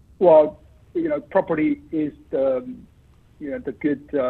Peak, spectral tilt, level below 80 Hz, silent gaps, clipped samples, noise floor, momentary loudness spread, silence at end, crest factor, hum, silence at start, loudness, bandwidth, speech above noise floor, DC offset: -4 dBFS; -9.5 dB/octave; -54 dBFS; none; under 0.1%; -53 dBFS; 17 LU; 0 s; 18 dB; none; 0.2 s; -21 LUFS; 4.2 kHz; 32 dB; under 0.1%